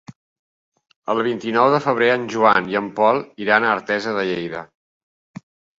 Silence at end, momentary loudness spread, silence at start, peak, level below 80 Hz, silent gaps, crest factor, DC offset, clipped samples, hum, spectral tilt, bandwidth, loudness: 1.15 s; 9 LU; 0.1 s; 0 dBFS; -64 dBFS; 0.16-0.72 s, 0.96-1.02 s; 20 dB; under 0.1%; under 0.1%; none; -5.5 dB/octave; 7.8 kHz; -19 LUFS